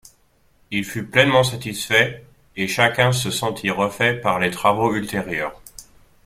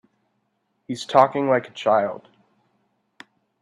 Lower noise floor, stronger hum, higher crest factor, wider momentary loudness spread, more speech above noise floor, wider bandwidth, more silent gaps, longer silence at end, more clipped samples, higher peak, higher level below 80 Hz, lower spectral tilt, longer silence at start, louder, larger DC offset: second, -59 dBFS vs -72 dBFS; neither; about the same, 20 dB vs 24 dB; second, 11 LU vs 15 LU; second, 39 dB vs 52 dB; first, 16 kHz vs 11 kHz; neither; second, 0.4 s vs 1.45 s; neither; about the same, -2 dBFS vs 0 dBFS; first, -52 dBFS vs -72 dBFS; second, -4 dB/octave vs -5.5 dB/octave; second, 0.7 s vs 0.9 s; about the same, -20 LUFS vs -21 LUFS; neither